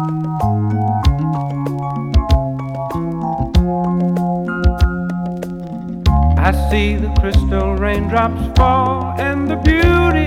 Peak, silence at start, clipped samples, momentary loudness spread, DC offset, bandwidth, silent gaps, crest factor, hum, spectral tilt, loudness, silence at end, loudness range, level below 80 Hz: -2 dBFS; 0 s; under 0.1%; 8 LU; under 0.1%; 13 kHz; none; 12 dB; none; -7.5 dB/octave; -17 LUFS; 0 s; 3 LU; -20 dBFS